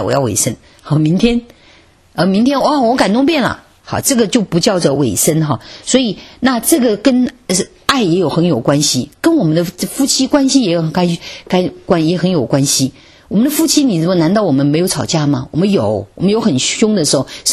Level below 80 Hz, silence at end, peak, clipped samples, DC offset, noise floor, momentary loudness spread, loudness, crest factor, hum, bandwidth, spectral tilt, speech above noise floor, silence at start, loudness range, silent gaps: -44 dBFS; 0 s; 0 dBFS; under 0.1%; under 0.1%; -46 dBFS; 6 LU; -13 LUFS; 14 dB; none; 13.5 kHz; -4.5 dB/octave; 33 dB; 0 s; 1 LU; none